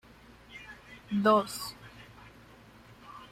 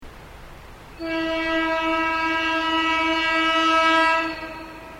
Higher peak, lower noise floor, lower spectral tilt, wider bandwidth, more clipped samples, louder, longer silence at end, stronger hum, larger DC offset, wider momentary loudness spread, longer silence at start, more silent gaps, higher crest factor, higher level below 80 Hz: second, -12 dBFS vs -6 dBFS; first, -55 dBFS vs -42 dBFS; first, -5 dB/octave vs -3 dB/octave; about the same, 16.5 kHz vs 16 kHz; neither; second, -29 LUFS vs -20 LUFS; about the same, 0.05 s vs 0 s; neither; neither; first, 27 LU vs 13 LU; first, 0.5 s vs 0 s; neither; first, 22 dB vs 16 dB; second, -64 dBFS vs -46 dBFS